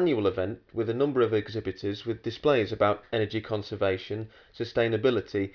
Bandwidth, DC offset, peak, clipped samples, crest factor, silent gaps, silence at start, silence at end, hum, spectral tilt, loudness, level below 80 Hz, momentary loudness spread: 5.4 kHz; under 0.1%; -10 dBFS; under 0.1%; 18 dB; none; 0 s; 0.05 s; none; -7.5 dB/octave; -28 LUFS; -60 dBFS; 9 LU